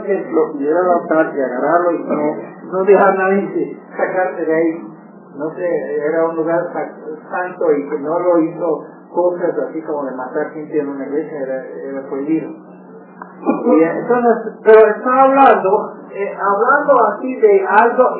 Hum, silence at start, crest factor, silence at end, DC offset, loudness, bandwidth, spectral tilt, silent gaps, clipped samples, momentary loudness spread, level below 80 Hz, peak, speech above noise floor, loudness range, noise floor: none; 0 s; 16 dB; 0 s; under 0.1%; -15 LUFS; 4 kHz; -10.5 dB/octave; none; under 0.1%; 14 LU; -68 dBFS; 0 dBFS; 23 dB; 9 LU; -37 dBFS